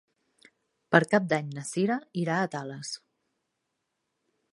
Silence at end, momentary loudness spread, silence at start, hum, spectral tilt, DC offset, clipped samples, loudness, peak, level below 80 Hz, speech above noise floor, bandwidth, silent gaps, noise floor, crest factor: 1.55 s; 15 LU; 0.9 s; none; -5.5 dB/octave; under 0.1%; under 0.1%; -28 LUFS; -2 dBFS; -78 dBFS; 54 dB; 11.5 kHz; none; -81 dBFS; 28 dB